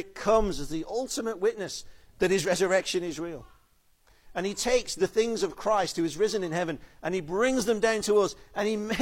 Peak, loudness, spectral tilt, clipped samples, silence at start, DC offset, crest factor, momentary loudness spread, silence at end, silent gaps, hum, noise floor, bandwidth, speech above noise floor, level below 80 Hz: -10 dBFS; -28 LUFS; -4 dB/octave; under 0.1%; 0 s; under 0.1%; 18 dB; 10 LU; 0 s; none; none; -64 dBFS; 16.5 kHz; 36 dB; -48 dBFS